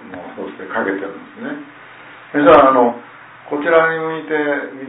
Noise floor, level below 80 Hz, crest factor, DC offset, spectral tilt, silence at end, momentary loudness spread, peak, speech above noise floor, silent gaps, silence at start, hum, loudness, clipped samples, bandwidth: -39 dBFS; -50 dBFS; 16 dB; under 0.1%; -9 dB/octave; 0 s; 21 LU; 0 dBFS; 24 dB; none; 0 s; none; -15 LUFS; under 0.1%; 4 kHz